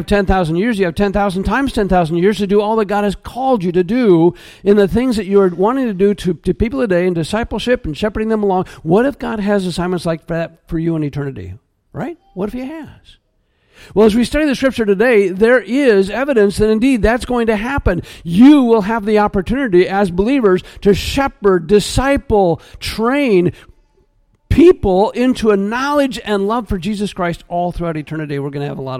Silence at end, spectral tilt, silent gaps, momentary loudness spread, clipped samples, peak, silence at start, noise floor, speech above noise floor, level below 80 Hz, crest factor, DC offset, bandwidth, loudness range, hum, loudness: 0 s; -6.5 dB/octave; none; 10 LU; under 0.1%; 0 dBFS; 0 s; -61 dBFS; 46 dB; -32 dBFS; 14 dB; under 0.1%; 15.5 kHz; 6 LU; none; -15 LUFS